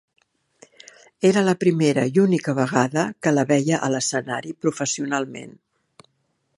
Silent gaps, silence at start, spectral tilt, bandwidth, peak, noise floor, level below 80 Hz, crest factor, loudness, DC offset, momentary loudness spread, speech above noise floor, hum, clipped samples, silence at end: none; 1.2 s; -5 dB/octave; 11.5 kHz; -2 dBFS; -70 dBFS; -68 dBFS; 20 dB; -21 LUFS; under 0.1%; 8 LU; 50 dB; none; under 0.1%; 1.1 s